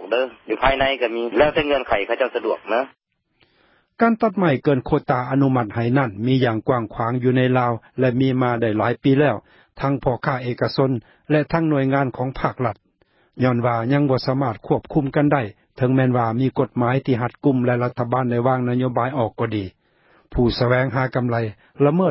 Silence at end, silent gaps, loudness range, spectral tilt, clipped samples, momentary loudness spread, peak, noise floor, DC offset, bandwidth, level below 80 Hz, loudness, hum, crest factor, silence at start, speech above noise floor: 0 s; none; 2 LU; -12 dB/octave; under 0.1%; 6 LU; -2 dBFS; -63 dBFS; under 0.1%; 5.8 kHz; -44 dBFS; -20 LUFS; none; 18 dB; 0 s; 44 dB